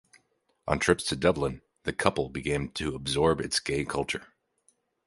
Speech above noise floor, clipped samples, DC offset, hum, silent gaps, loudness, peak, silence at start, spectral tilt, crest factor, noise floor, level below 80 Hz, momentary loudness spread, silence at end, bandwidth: 44 dB; under 0.1%; under 0.1%; none; none; -28 LUFS; -4 dBFS; 0.65 s; -4.5 dB/octave; 26 dB; -72 dBFS; -48 dBFS; 9 LU; 0.8 s; 12 kHz